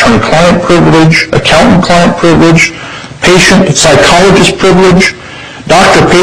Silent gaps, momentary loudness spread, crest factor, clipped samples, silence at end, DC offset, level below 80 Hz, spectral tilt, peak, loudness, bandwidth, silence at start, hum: none; 7 LU; 4 dB; 1%; 0 s; 3%; -26 dBFS; -4.5 dB/octave; 0 dBFS; -4 LUFS; 15.5 kHz; 0 s; none